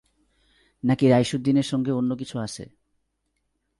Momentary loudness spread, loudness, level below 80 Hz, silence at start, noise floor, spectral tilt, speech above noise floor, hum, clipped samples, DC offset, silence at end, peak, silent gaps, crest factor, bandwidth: 13 LU; -23 LUFS; -60 dBFS; 0.85 s; -75 dBFS; -6.5 dB/octave; 53 dB; none; under 0.1%; under 0.1%; 1.15 s; -8 dBFS; none; 18 dB; 11.5 kHz